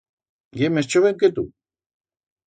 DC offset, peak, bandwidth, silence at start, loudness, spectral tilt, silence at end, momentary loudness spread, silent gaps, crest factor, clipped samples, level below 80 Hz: under 0.1%; -6 dBFS; 9.4 kHz; 0.55 s; -20 LUFS; -5.5 dB/octave; 1 s; 15 LU; none; 18 dB; under 0.1%; -58 dBFS